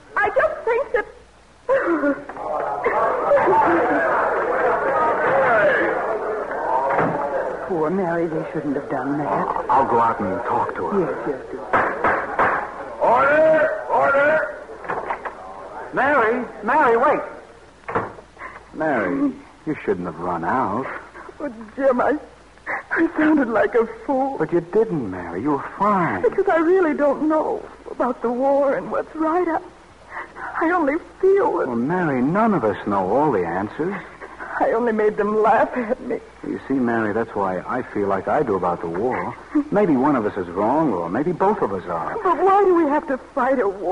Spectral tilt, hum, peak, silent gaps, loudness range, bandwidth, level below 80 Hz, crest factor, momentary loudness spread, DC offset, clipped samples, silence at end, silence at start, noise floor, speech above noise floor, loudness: -7.5 dB/octave; none; -6 dBFS; none; 4 LU; 11 kHz; -52 dBFS; 14 dB; 12 LU; 0.1%; under 0.1%; 0 s; 0.1 s; -49 dBFS; 29 dB; -20 LUFS